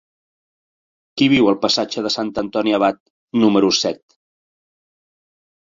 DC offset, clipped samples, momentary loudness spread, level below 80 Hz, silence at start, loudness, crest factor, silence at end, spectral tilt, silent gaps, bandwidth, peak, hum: under 0.1%; under 0.1%; 10 LU; -58 dBFS; 1.15 s; -17 LUFS; 18 dB; 1.8 s; -4.5 dB/octave; 3.00-3.28 s; 7.8 kHz; -2 dBFS; none